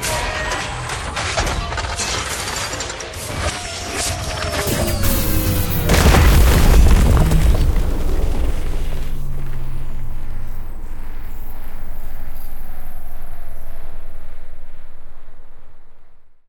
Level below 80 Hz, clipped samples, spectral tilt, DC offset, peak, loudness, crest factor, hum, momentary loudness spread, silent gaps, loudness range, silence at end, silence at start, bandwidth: -20 dBFS; under 0.1%; -4.5 dB/octave; under 0.1%; 0 dBFS; -19 LUFS; 16 dB; none; 22 LU; none; 21 LU; 0.15 s; 0 s; 17.5 kHz